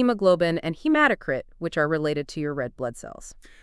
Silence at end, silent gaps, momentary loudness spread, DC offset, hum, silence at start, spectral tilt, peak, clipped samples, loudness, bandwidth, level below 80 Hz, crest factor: 0.3 s; none; 13 LU; under 0.1%; none; 0 s; -6 dB/octave; -6 dBFS; under 0.1%; -24 LUFS; 12 kHz; -52 dBFS; 18 dB